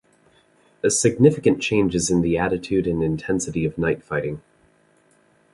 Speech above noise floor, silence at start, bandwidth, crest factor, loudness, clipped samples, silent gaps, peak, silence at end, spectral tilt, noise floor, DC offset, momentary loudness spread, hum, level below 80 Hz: 39 dB; 0.85 s; 11.5 kHz; 20 dB; -21 LUFS; under 0.1%; none; -2 dBFS; 1.15 s; -5 dB/octave; -59 dBFS; under 0.1%; 9 LU; none; -46 dBFS